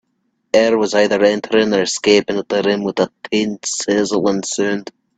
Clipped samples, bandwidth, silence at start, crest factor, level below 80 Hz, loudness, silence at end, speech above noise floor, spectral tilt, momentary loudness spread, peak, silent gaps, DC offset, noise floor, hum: under 0.1%; 9.2 kHz; 0.55 s; 16 dB; -56 dBFS; -16 LUFS; 0.35 s; 51 dB; -3.5 dB/octave; 6 LU; 0 dBFS; none; under 0.1%; -67 dBFS; none